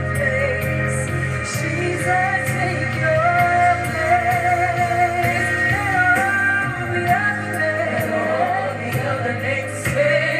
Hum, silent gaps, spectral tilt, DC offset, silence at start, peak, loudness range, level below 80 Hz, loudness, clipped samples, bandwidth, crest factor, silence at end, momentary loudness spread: none; none; -5.5 dB/octave; under 0.1%; 0 s; -4 dBFS; 3 LU; -48 dBFS; -19 LUFS; under 0.1%; 15.5 kHz; 16 dB; 0 s; 6 LU